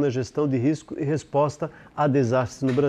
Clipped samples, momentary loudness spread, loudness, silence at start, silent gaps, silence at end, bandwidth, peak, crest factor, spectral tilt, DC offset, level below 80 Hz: under 0.1%; 6 LU; -24 LUFS; 0 s; none; 0 s; 10 kHz; -10 dBFS; 14 dB; -7.5 dB/octave; under 0.1%; -60 dBFS